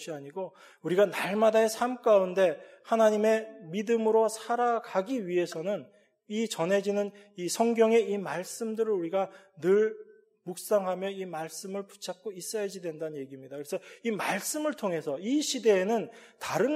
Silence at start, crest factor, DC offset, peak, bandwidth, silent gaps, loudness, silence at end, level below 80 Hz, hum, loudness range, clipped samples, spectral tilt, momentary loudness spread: 0 s; 18 dB; under 0.1%; -12 dBFS; 15.5 kHz; none; -29 LUFS; 0 s; -84 dBFS; none; 8 LU; under 0.1%; -4.5 dB/octave; 15 LU